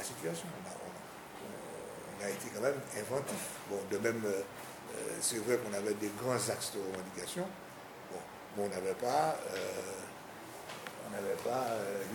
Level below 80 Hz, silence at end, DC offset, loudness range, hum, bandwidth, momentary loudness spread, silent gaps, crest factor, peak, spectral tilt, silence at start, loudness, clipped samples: -74 dBFS; 0 s; under 0.1%; 4 LU; none; 20 kHz; 13 LU; none; 20 dB; -18 dBFS; -3.5 dB/octave; 0 s; -38 LUFS; under 0.1%